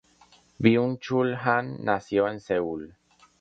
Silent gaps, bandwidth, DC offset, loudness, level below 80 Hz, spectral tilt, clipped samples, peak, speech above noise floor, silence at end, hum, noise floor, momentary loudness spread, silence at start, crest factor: none; 7.8 kHz; under 0.1%; -25 LUFS; -62 dBFS; -7.5 dB/octave; under 0.1%; -4 dBFS; 34 dB; 0.5 s; none; -59 dBFS; 9 LU; 0.6 s; 22 dB